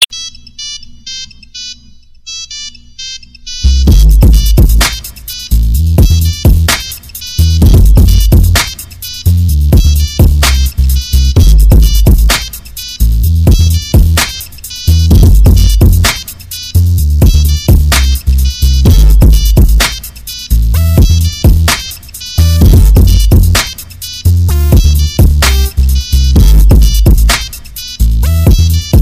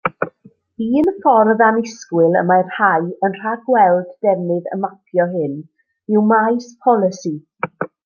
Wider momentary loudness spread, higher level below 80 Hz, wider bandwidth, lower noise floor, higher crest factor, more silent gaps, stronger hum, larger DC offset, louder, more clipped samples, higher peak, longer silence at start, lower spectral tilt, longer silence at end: about the same, 15 LU vs 13 LU; first, -8 dBFS vs -64 dBFS; first, 16 kHz vs 7 kHz; second, -36 dBFS vs -50 dBFS; second, 6 dB vs 16 dB; neither; neither; neither; first, -9 LUFS vs -17 LUFS; first, 0.8% vs under 0.1%; about the same, 0 dBFS vs 0 dBFS; about the same, 0 s vs 0.05 s; second, -5 dB/octave vs -7 dB/octave; second, 0 s vs 0.2 s